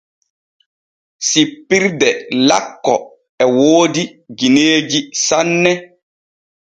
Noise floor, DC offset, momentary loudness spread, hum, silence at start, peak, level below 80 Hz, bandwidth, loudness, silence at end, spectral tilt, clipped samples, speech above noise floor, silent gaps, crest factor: under -90 dBFS; under 0.1%; 8 LU; none; 1.2 s; 0 dBFS; -60 dBFS; 9.4 kHz; -14 LUFS; 0.9 s; -3 dB/octave; under 0.1%; over 76 dB; 3.29-3.38 s; 16 dB